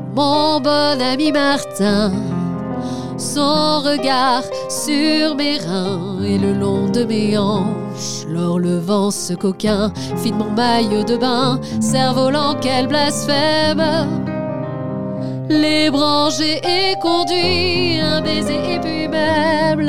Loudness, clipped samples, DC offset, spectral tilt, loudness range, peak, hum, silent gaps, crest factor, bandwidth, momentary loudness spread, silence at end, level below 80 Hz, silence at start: -17 LUFS; under 0.1%; 2%; -4.5 dB/octave; 3 LU; -2 dBFS; none; none; 14 dB; 16 kHz; 8 LU; 0 s; -52 dBFS; 0 s